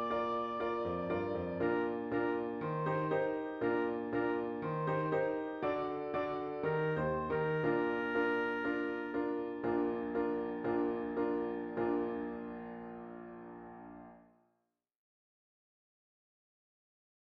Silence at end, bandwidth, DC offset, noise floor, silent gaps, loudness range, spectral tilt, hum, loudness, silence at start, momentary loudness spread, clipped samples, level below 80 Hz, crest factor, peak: 3 s; 6.2 kHz; under 0.1%; -84 dBFS; none; 10 LU; -9 dB/octave; none; -36 LUFS; 0 s; 12 LU; under 0.1%; -66 dBFS; 16 dB; -22 dBFS